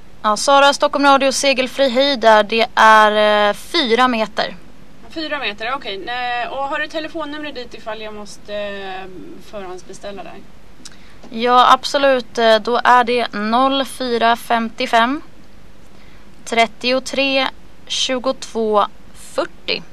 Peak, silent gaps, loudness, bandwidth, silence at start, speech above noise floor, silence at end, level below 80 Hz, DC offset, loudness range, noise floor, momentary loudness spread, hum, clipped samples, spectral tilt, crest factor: 0 dBFS; none; -16 LUFS; 14 kHz; 0.25 s; 28 dB; 0.1 s; -50 dBFS; 2%; 15 LU; -45 dBFS; 20 LU; none; under 0.1%; -2.5 dB/octave; 18 dB